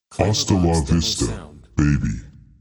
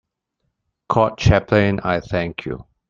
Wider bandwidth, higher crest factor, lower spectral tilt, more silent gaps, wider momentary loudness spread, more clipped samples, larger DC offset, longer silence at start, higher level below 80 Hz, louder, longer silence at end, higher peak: first, 19 kHz vs 7.4 kHz; about the same, 20 dB vs 20 dB; second, -5 dB/octave vs -7 dB/octave; neither; about the same, 11 LU vs 11 LU; neither; neither; second, 0.1 s vs 0.9 s; first, -32 dBFS vs -38 dBFS; about the same, -20 LUFS vs -19 LUFS; about the same, 0.3 s vs 0.25 s; about the same, -2 dBFS vs 0 dBFS